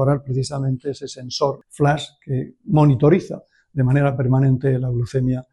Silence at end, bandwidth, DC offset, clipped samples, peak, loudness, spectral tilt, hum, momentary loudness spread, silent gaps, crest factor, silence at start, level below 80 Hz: 0.1 s; 10.5 kHz; under 0.1%; under 0.1%; -2 dBFS; -20 LUFS; -7.5 dB/octave; none; 12 LU; none; 16 dB; 0 s; -46 dBFS